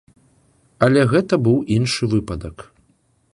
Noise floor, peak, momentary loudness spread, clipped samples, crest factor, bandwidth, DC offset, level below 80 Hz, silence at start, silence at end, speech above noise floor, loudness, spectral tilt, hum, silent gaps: -61 dBFS; -2 dBFS; 15 LU; under 0.1%; 18 dB; 11.5 kHz; under 0.1%; -44 dBFS; 0.8 s; 0.7 s; 44 dB; -18 LUFS; -6.5 dB/octave; none; none